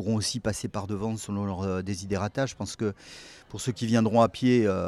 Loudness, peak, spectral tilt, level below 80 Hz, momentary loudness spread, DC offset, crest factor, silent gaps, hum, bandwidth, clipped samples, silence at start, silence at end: -28 LUFS; -8 dBFS; -5.5 dB/octave; -56 dBFS; 11 LU; under 0.1%; 18 dB; none; none; 13.5 kHz; under 0.1%; 0 s; 0 s